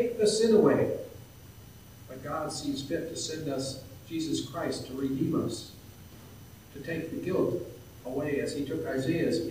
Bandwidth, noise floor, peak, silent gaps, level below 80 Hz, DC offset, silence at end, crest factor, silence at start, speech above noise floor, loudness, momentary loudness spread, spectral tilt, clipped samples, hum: 16 kHz; -50 dBFS; -10 dBFS; none; -60 dBFS; under 0.1%; 0 s; 20 dB; 0 s; 21 dB; -30 LUFS; 24 LU; -5 dB/octave; under 0.1%; none